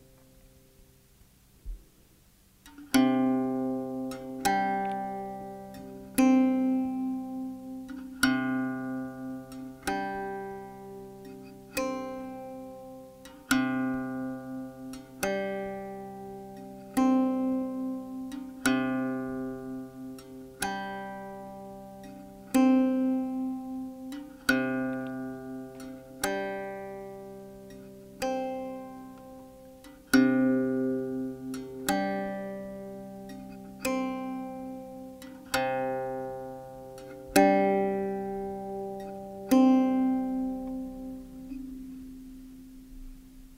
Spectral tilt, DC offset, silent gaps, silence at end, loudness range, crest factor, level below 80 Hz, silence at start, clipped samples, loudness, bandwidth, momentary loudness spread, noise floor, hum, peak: -5 dB/octave; under 0.1%; none; 0 s; 8 LU; 28 dB; -56 dBFS; 0.8 s; under 0.1%; -30 LUFS; 16 kHz; 21 LU; -60 dBFS; none; -4 dBFS